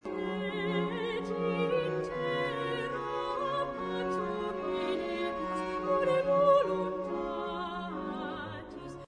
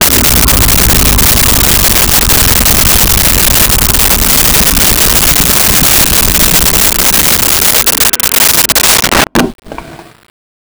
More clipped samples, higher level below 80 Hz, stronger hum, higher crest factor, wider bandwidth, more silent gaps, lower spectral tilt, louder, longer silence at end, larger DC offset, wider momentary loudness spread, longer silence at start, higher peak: neither; second, -58 dBFS vs -18 dBFS; neither; first, 18 dB vs 8 dB; second, 10.5 kHz vs over 20 kHz; neither; first, -6.5 dB/octave vs -2 dB/octave; second, -32 LUFS vs -5 LUFS; second, 0 s vs 0.65 s; neither; first, 10 LU vs 1 LU; about the same, 0.05 s vs 0 s; second, -14 dBFS vs 0 dBFS